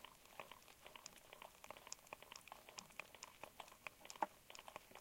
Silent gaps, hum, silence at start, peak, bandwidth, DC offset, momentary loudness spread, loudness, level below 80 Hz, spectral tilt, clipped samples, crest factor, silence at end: none; none; 0 s; -26 dBFS; 17 kHz; under 0.1%; 11 LU; -55 LUFS; -80 dBFS; -1.5 dB/octave; under 0.1%; 32 dB; 0 s